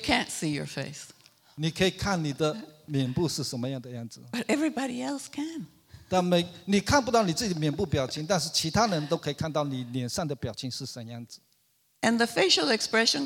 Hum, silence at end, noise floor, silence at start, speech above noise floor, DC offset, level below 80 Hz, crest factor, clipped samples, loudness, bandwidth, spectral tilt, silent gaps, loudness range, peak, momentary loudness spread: none; 0 s; -69 dBFS; 0 s; 41 dB; under 0.1%; -54 dBFS; 22 dB; under 0.1%; -28 LUFS; 18.5 kHz; -4 dB/octave; none; 5 LU; -8 dBFS; 15 LU